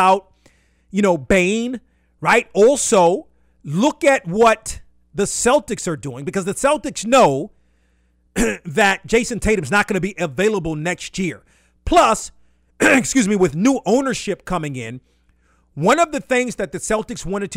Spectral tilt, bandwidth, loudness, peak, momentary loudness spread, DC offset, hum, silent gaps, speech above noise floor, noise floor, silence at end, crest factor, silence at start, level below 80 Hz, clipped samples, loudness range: -4 dB/octave; 16 kHz; -18 LUFS; -4 dBFS; 13 LU; under 0.1%; none; none; 43 dB; -60 dBFS; 0 s; 14 dB; 0 s; -40 dBFS; under 0.1%; 3 LU